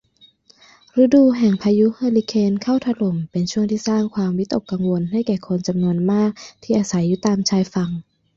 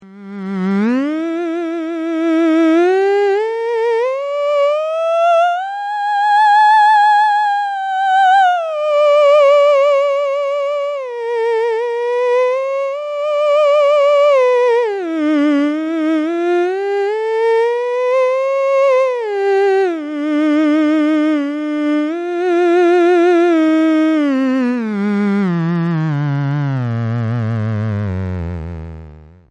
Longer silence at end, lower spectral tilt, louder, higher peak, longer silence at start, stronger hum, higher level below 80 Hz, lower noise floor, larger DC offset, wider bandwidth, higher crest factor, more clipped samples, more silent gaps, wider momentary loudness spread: about the same, 0.35 s vs 0.25 s; about the same, -6.5 dB/octave vs -7 dB/octave; second, -19 LUFS vs -14 LUFS; about the same, -4 dBFS vs -4 dBFS; first, 0.95 s vs 0 s; neither; about the same, -56 dBFS vs -52 dBFS; first, -53 dBFS vs -38 dBFS; neither; second, 7.6 kHz vs 10 kHz; first, 16 dB vs 10 dB; neither; neither; about the same, 8 LU vs 9 LU